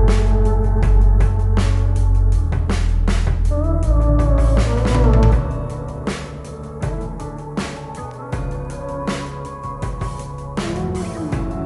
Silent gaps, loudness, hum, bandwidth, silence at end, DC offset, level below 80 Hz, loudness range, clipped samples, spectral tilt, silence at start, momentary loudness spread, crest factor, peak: none; -20 LUFS; none; 11.5 kHz; 0 s; under 0.1%; -18 dBFS; 10 LU; under 0.1%; -7 dB/octave; 0 s; 13 LU; 14 dB; -2 dBFS